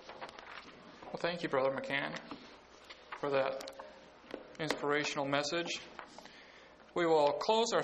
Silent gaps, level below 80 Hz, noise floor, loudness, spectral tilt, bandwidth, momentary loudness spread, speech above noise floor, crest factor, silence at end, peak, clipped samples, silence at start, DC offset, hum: none; -72 dBFS; -58 dBFS; -34 LUFS; -3.5 dB/octave; 9 kHz; 23 LU; 24 dB; 22 dB; 0 s; -14 dBFS; under 0.1%; 0 s; under 0.1%; none